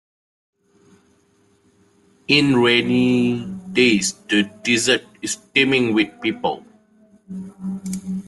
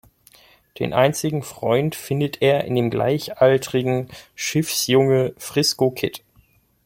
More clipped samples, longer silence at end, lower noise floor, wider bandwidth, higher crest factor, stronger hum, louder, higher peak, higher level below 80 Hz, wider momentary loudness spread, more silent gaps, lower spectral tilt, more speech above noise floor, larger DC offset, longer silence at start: neither; second, 0 s vs 0.7 s; about the same, -59 dBFS vs -58 dBFS; second, 12.5 kHz vs 16.5 kHz; about the same, 20 dB vs 18 dB; neither; about the same, -18 LUFS vs -20 LUFS; about the same, -2 dBFS vs -4 dBFS; about the same, -58 dBFS vs -56 dBFS; first, 15 LU vs 9 LU; neither; about the same, -4 dB/octave vs -5 dB/octave; about the same, 41 dB vs 38 dB; neither; first, 2.3 s vs 0.8 s